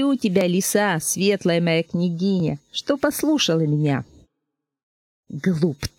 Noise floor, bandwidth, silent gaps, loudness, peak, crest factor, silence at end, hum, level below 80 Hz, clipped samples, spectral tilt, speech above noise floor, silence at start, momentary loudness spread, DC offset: -80 dBFS; 17 kHz; 4.83-5.23 s; -21 LUFS; -4 dBFS; 16 dB; 0.1 s; none; -52 dBFS; under 0.1%; -5 dB/octave; 60 dB; 0 s; 6 LU; under 0.1%